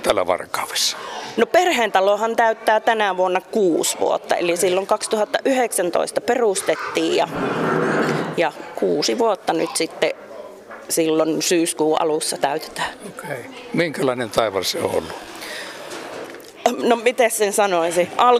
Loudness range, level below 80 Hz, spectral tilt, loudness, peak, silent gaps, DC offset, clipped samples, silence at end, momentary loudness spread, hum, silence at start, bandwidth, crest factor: 5 LU; -60 dBFS; -3 dB/octave; -20 LUFS; -2 dBFS; none; under 0.1%; under 0.1%; 0 s; 14 LU; none; 0 s; 15.5 kHz; 18 dB